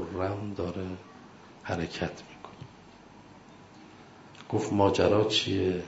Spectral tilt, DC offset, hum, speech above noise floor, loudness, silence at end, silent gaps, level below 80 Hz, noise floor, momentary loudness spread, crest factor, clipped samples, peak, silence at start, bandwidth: -5.5 dB/octave; under 0.1%; none; 24 dB; -29 LUFS; 0 s; none; -60 dBFS; -52 dBFS; 27 LU; 22 dB; under 0.1%; -8 dBFS; 0 s; 8 kHz